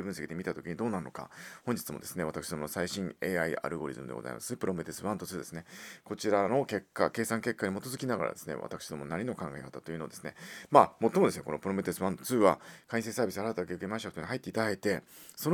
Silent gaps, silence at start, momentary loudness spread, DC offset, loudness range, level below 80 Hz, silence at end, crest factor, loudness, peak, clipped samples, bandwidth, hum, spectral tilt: none; 0 s; 14 LU; under 0.1%; 7 LU; -66 dBFS; 0 s; 28 dB; -33 LUFS; -4 dBFS; under 0.1%; over 20 kHz; none; -5 dB/octave